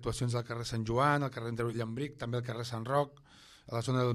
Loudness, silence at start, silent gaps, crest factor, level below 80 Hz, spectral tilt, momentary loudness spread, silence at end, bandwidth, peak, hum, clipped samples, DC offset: -34 LUFS; 0 s; none; 18 dB; -58 dBFS; -6 dB/octave; 9 LU; 0 s; 13 kHz; -14 dBFS; none; under 0.1%; under 0.1%